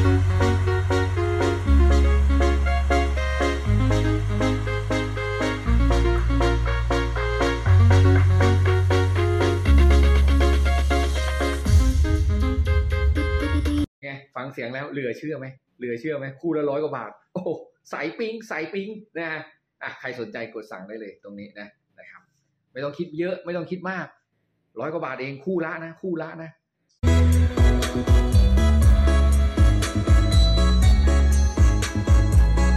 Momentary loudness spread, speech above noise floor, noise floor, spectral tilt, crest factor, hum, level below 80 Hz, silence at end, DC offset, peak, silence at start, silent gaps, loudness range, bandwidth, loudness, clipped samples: 16 LU; 42 dB; -72 dBFS; -6.5 dB/octave; 14 dB; none; -22 dBFS; 0 s; under 0.1%; -8 dBFS; 0 s; 13.88-14.02 s; 14 LU; 12.5 kHz; -22 LUFS; under 0.1%